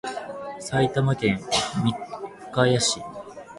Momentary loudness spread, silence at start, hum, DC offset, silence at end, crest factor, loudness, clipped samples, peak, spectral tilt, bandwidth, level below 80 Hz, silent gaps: 15 LU; 0.05 s; none; under 0.1%; 0 s; 20 dB; -24 LUFS; under 0.1%; -4 dBFS; -4.5 dB/octave; 11.5 kHz; -54 dBFS; none